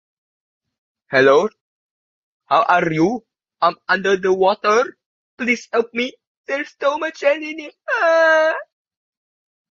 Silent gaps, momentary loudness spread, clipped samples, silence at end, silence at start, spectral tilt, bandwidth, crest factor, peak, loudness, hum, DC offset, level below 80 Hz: 1.61-2.40 s, 5.06-5.37 s, 6.27-6.44 s; 12 LU; under 0.1%; 1.1 s; 1.1 s; -4.5 dB/octave; 7.6 kHz; 18 dB; -2 dBFS; -18 LUFS; none; under 0.1%; -64 dBFS